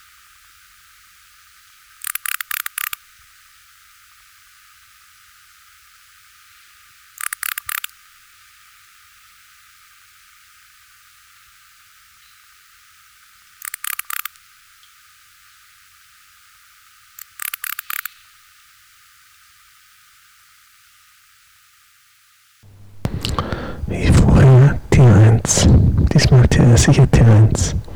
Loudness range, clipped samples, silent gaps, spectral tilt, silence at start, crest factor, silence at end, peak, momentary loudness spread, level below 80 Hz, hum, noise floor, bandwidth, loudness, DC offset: 22 LU; under 0.1%; none; -5.5 dB/octave; 22.95 s; 16 dB; 0 s; -4 dBFS; 19 LU; -30 dBFS; none; -54 dBFS; 20 kHz; -15 LUFS; under 0.1%